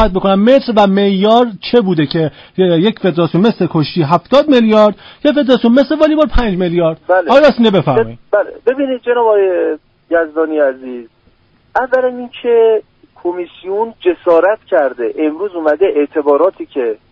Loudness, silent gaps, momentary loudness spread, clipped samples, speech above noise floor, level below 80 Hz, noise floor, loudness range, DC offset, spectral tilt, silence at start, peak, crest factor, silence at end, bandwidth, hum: -12 LUFS; none; 9 LU; under 0.1%; 40 dB; -30 dBFS; -51 dBFS; 5 LU; under 0.1%; -8 dB/octave; 0 s; 0 dBFS; 12 dB; 0.15 s; 7.4 kHz; none